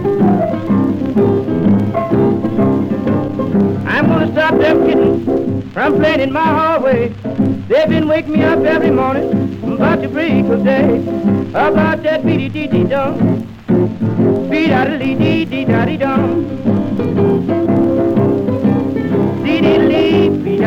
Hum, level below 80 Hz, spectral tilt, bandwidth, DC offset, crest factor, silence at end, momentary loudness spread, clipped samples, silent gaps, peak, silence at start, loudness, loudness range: none; -42 dBFS; -8.5 dB/octave; 7.2 kHz; under 0.1%; 12 dB; 0 s; 4 LU; under 0.1%; none; 0 dBFS; 0 s; -14 LUFS; 1 LU